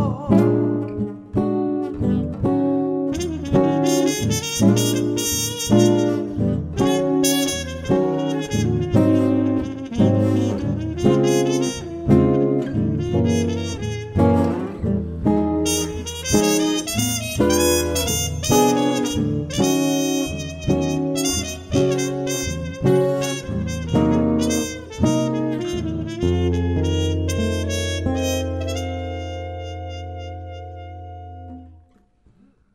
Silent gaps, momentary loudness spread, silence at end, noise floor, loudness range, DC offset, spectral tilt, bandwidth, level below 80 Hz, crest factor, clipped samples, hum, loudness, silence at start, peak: none; 10 LU; 1 s; -56 dBFS; 5 LU; under 0.1%; -5 dB/octave; 16 kHz; -38 dBFS; 18 dB; under 0.1%; none; -20 LUFS; 0 s; -2 dBFS